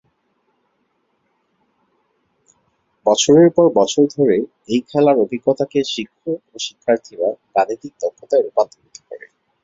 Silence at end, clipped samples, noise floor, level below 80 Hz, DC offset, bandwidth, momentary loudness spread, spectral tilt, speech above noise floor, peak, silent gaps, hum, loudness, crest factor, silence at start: 0.45 s; under 0.1%; -67 dBFS; -60 dBFS; under 0.1%; 7.8 kHz; 14 LU; -5 dB/octave; 50 dB; -2 dBFS; none; none; -17 LUFS; 18 dB; 3.05 s